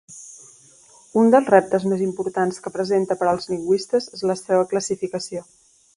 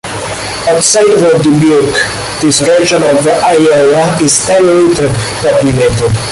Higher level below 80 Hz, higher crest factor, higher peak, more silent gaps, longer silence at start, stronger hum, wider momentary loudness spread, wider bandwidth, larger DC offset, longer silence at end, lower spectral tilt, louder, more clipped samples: second, -64 dBFS vs -34 dBFS; first, 20 dB vs 8 dB; about the same, 0 dBFS vs 0 dBFS; neither; about the same, 0.1 s vs 0.05 s; neither; first, 14 LU vs 6 LU; about the same, 11.5 kHz vs 12 kHz; neither; first, 0.55 s vs 0 s; first, -5.5 dB/octave vs -4 dB/octave; second, -21 LUFS vs -8 LUFS; neither